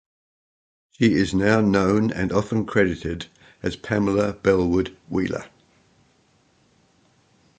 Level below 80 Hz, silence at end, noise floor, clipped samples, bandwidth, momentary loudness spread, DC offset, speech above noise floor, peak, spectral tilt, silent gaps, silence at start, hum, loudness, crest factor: -46 dBFS; 2.1 s; -61 dBFS; under 0.1%; 9.2 kHz; 12 LU; under 0.1%; 40 dB; -4 dBFS; -6.5 dB/octave; none; 1 s; none; -22 LUFS; 20 dB